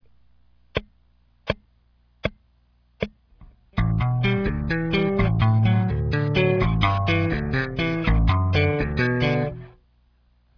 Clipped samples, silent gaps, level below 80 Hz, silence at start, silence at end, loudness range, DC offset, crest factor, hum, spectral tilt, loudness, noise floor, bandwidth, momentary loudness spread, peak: under 0.1%; none; -32 dBFS; 0.75 s; 0.9 s; 13 LU; under 0.1%; 18 dB; 60 Hz at -50 dBFS; -8.5 dB/octave; -23 LUFS; -61 dBFS; 5.4 kHz; 12 LU; -4 dBFS